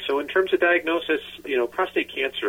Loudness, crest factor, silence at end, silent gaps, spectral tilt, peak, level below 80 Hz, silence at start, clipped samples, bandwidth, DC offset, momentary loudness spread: -23 LUFS; 14 dB; 0 s; none; -4 dB/octave; -10 dBFS; -62 dBFS; 0 s; under 0.1%; 16.5 kHz; under 0.1%; 7 LU